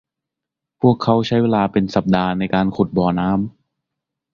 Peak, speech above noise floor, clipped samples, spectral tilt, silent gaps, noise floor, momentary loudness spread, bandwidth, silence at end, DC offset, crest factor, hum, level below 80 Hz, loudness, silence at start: -2 dBFS; 67 dB; under 0.1%; -8 dB/octave; none; -84 dBFS; 3 LU; 7 kHz; 0.85 s; under 0.1%; 18 dB; none; -46 dBFS; -18 LUFS; 0.8 s